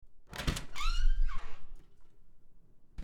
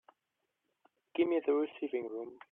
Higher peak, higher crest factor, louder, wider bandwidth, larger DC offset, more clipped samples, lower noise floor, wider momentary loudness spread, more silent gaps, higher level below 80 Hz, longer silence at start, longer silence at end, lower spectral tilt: first, -14 dBFS vs -20 dBFS; about the same, 16 dB vs 18 dB; second, -38 LUFS vs -35 LUFS; first, 11.5 kHz vs 3.8 kHz; neither; neither; second, -52 dBFS vs -85 dBFS; first, 21 LU vs 11 LU; neither; first, -34 dBFS vs -84 dBFS; second, 0.05 s vs 1.15 s; second, 0 s vs 0.15 s; second, -4 dB/octave vs -8 dB/octave